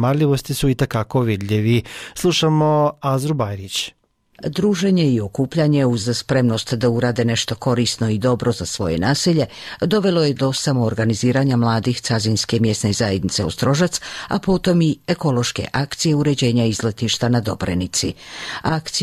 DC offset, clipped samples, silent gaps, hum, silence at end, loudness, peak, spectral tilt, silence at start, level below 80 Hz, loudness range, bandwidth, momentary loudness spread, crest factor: under 0.1%; under 0.1%; none; none; 0 s; -19 LUFS; -8 dBFS; -5.5 dB/octave; 0 s; -44 dBFS; 1 LU; 15.5 kHz; 6 LU; 12 dB